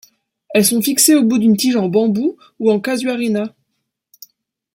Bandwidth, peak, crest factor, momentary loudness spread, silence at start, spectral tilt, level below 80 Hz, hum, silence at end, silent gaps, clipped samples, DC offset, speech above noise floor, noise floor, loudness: 16.5 kHz; 0 dBFS; 16 dB; 9 LU; 0.5 s; -4 dB/octave; -62 dBFS; none; 1.25 s; none; under 0.1%; under 0.1%; 59 dB; -73 dBFS; -15 LUFS